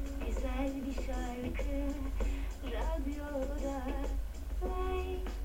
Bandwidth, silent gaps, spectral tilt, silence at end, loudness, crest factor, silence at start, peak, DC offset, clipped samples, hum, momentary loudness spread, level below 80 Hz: 16.5 kHz; none; -6.5 dB/octave; 0 s; -38 LUFS; 14 dB; 0 s; -22 dBFS; under 0.1%; under 0.1%; none; 4 LU; -38 dBFS